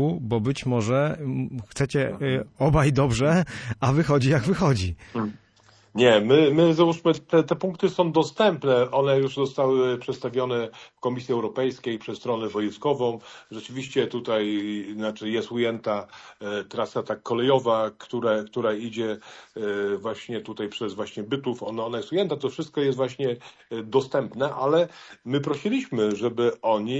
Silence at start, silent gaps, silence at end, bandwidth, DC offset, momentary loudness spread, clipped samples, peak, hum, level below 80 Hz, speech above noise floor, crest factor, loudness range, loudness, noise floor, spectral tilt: 0 s; none; 0 s; 10.5 kHz; under 0.1%; 11 LU; under 0.1%; -6 dBFS; none; -50 dBFS; 33 dB; 18 dB; 7 LU; -25 LUFS; -57 dBFS; -6.5 dB/octave